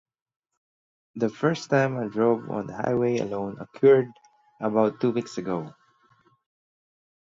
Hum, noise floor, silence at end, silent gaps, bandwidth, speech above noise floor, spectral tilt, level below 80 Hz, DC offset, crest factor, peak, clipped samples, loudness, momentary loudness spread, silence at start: none; -63 dBFS; 1.5 s; none; 7.6 kHz; 39 dB; -7 dB/octave; -66 dBFS; under 0.1%; 20 dB; -8 dBFS; under 0.1%; -25 LUFS; 13 LU; 1.15 s